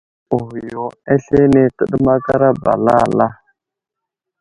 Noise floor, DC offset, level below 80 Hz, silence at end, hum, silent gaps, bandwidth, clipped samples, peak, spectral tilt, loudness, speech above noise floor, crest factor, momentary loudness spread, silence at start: -82 dBFS; under 0.1%; -42 dBFS; 1.05 s; none; none; 11 kHz; under 0.1%; 0 dBFS; -9 dB/octave; -15 LUFS; 68 dB; 16 dB; 12 LU; 0.3 s